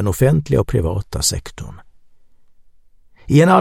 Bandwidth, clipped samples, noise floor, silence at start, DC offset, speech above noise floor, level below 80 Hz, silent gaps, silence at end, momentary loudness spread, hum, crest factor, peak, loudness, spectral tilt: 16.5 kHz; under 0.1%; -47 dBFS; 0 s; under 0.1%; 31 dB; -34 dBFS; none; 0 s; 20 LU; none; 18 dB; 0 dBFS; -17 LUFS; -5.5 dB/octave